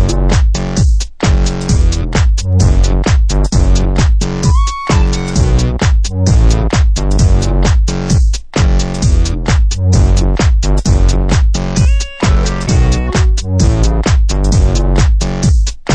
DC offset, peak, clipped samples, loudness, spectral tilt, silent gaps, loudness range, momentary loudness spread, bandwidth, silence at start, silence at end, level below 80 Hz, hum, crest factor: under 0.1%; 0 dBFS; under 0.1%; -13 LUFS; -5.5 dB/octave; none; 1 LU; 2 LU; 9.6 kHz; 0 s; 0 s; -12 dBFS; none; 8 dB